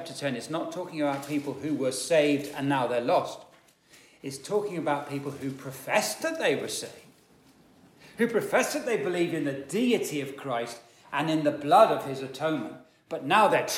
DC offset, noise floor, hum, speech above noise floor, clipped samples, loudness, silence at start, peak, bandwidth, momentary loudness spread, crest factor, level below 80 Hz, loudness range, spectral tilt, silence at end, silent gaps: under 0.1%; -59 dBFS; none; 31 dB; under 0.1%; -28 LUFS; 0 s; -6 dBFS; 17 kHz; 14 LU; 22 dB; -74 dBFS; 5 LU; -4.5 dB/octave; 0 s; none